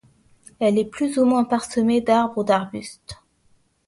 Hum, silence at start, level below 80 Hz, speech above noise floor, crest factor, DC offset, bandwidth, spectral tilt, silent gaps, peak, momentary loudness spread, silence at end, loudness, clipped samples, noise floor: none; 0.6 s; -58 dBFS; 41 dB; 18 dB; under 0.1%; 11.5 kHz; -5.5 dB/octave; none; -4 dBFS; 16 LU; 0.75 s; -20 LUFS; under 0.1%; -61 dBFS